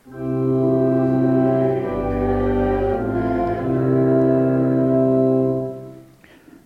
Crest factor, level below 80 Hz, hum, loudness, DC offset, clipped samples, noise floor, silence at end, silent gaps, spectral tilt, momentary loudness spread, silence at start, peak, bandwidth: 12 dB; -38 dBFS; none; -19 LUFS; under 0.1%; under 0.1%; -47 dBFS; 0.65 s; none; -10.5 dB/octave; 6 LU; 0.05 s; -6 dBFS; 4.3 kHz